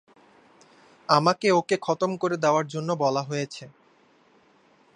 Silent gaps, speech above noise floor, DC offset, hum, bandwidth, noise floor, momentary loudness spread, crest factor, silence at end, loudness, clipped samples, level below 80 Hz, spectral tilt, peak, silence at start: none; 36 dB; under 0.1%; none; 11 kHz; -60 dBFS; 11 LU; 24 dB; 1.3 s; -24 LUFS; under 0.1%; -76 dBFS; -5 dB/octave; -4 dBFS; 1.1 s